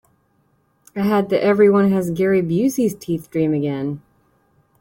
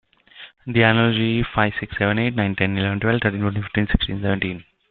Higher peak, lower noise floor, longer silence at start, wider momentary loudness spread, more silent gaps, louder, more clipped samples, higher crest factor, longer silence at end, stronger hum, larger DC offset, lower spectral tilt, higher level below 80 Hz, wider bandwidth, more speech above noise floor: about the same, -4 dBFS vs -2 dBFS; first, -62 dBFS vs -45 dBFS; first, 0.95 s vs 0.35 s; first, 12 LU vs 7 LU; neither; about the same, -18 LUFS vs -20 LUFS; neither; about the same, 16 dB vs 20 dB; first, 0.8 s vs 0.3 s; neither; neither; second, -7 dB/octave vs -11 dB/octave; second, -56 dBFS vs -38 dBFS; first, 17 kHz vs 4.4 kHz; first, 45 dB vs 25 dB